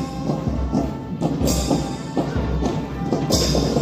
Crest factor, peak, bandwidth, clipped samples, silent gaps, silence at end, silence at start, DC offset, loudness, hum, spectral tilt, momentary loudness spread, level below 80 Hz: 18 dB; -4 dBFS; 16 kHz; under 0.1%; none; 0 s; 0 s; under 0.1%; -22 LUFS; none; -5.5 dB/octave; 6 LU; -30 dBFS